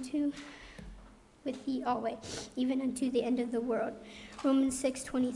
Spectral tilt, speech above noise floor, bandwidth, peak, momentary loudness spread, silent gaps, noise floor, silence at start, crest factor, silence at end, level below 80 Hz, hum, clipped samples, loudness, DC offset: -4.5 dB/octave; 23 dB; 11.5 kHz; -20 dBFS; 18 LU; none; -56 dBFS; 0 s; 14 dB; 0 s; -60 dBFS; none; under 0.1%; -34 LUFS; under 0.1%